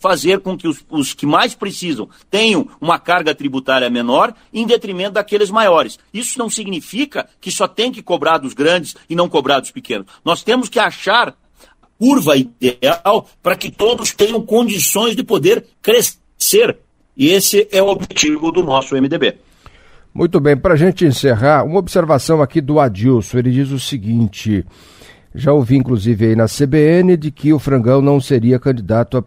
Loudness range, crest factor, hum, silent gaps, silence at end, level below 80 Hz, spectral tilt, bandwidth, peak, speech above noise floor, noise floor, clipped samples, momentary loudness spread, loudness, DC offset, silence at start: 4 LU; 14 dB; none; none; 0.05 s; -44 dBFS; -4.5 dB/octave; 16 kHz; 0 dBFS; 36 dB; -50 dBFS; under 0.1%; 9 LU; -14 LUFS; under 0.1%; 0 s